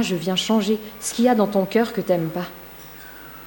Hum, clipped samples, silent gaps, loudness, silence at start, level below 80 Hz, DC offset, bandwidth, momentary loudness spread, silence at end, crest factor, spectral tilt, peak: none; under 0.1%; none; -21 LUFS; 0 s; -56 dBFS; under 0.1%; 16.5 kHz; 19 LU; 0 s; 18 dB; -5 dB/octave; -4 dBFS